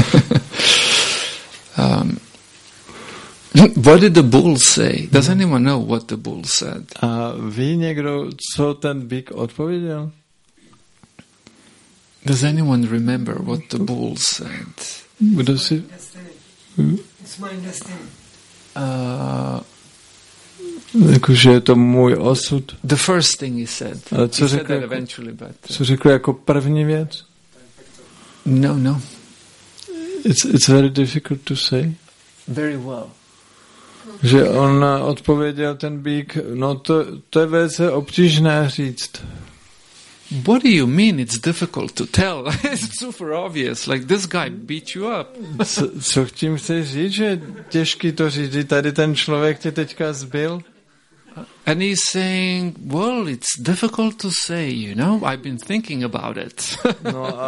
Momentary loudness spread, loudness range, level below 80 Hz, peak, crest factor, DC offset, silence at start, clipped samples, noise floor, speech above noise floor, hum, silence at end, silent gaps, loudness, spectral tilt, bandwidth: 17 LU; 9 LU; -50 dBFS; 0 dBFS; 18 dB; under 0.1%; 0 s; under 0.1%; -55 dBFS; 38 dB; none; 0 s; none; -17 LUFS; -5 dB/octave; 11.5 kHz